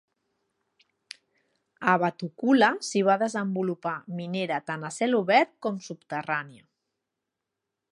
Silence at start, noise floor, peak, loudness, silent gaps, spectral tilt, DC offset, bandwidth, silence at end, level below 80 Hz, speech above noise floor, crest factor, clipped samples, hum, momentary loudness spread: 1.8 s; -85 dBFS; -6 dBFS; -26 LUFS; none; -5 dB/octave; under 0.1%; 11.5 kHz; 1.35 s; -80 dBFS; 59 dB; 22 dB; under 0.1%; none; 15 LU